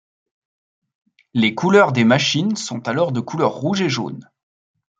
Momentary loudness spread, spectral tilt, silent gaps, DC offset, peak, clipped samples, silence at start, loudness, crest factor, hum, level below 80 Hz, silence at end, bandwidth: 10 LU; -5 dB/octave; none; under 0.1%; -2 dBFS; under 0.1%; 1.35 s; -18 LUFS; 18 dB; none; -62 dBFS; 0.8 s; 9 kHz